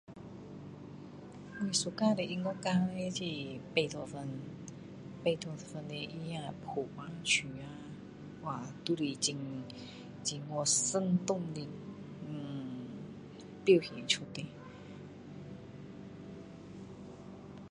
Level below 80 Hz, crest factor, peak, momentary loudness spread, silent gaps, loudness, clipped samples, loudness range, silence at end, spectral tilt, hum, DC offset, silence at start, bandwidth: -68 dBFS; 24 dB; -12 dBFS; 19 LU; none; -35 LUFS; under 0.1%; 6 LU; 0 s; -4 dB/octave; none; under 0.1%; 0.1 s; 11 kHz